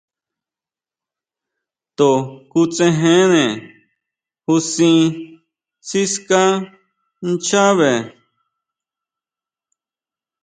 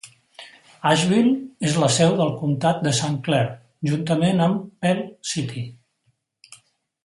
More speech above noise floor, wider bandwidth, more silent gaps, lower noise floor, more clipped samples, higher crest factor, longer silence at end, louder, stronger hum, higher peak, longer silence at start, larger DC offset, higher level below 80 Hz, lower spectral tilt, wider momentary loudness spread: first, over 75 dB vs 48 dB; second, 9.4 kHz vs 11.5 kHz; neither; first, under -90 dBFS vs -69 dBFS; neither; about the same, 18 dB vs 18 dB; first, 2.35 s vs 0.5 s; first, -16 LUFS vs -21 LUFS; neither; first, 0 dBFS vs -4 dBFS; first, 2 s vs 0.05 s; neither; about the same, -64 dBFS vs -62 dBFS; about the same, -4.5 dB/octave vs -5 dB/octave; first, 17 LU vs 10 LU